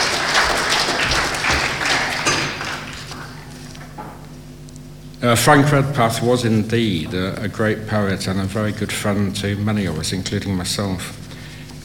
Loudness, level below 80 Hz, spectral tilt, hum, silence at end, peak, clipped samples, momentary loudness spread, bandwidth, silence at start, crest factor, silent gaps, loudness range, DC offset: -18 LUFS; -40 dBFS; -4 dB/octave; none; 0 s; 0 dBFS; under 0.1%; 19 LU; 18.5 kHz; 0 s; 20 dB; none; 5 LU; 0.2%